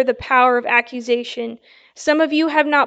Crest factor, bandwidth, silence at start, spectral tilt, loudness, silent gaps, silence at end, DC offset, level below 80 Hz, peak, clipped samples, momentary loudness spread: 16 dB; 8.6 kHz; 0 s; -3.5 dB/octave; -17 LUFS; none; 0 s; under 0.1%; -56 dBFS; -2 dBFS; under 0.1%; 12 LU